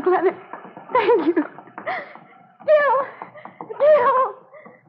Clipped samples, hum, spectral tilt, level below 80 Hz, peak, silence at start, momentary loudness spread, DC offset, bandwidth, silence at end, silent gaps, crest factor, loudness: under 0.1%; none; -3 dB/octave; -84 dBFS; -6 dBFS; 0 s; 23 LU; under 0.1%; 5.4 kHz; 0.3 s; none; 14 dB; -19 LUFS